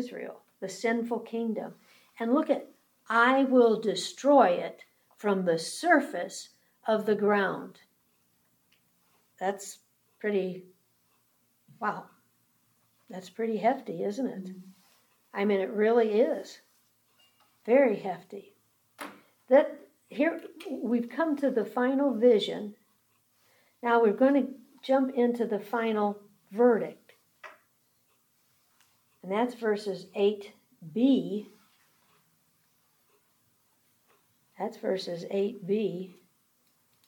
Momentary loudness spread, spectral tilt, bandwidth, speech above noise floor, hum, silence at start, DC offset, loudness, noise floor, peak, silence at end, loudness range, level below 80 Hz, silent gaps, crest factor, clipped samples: 20 LU; -5.5 dB/octave; 19 kHz; 43 dB; none; 0 s; under 0.1%; -28 LUFS; -71 dBFS; -8 dBFS; 0.95 s; 12 LU; under -90 dBFS; none; 22 dB; under 0.1%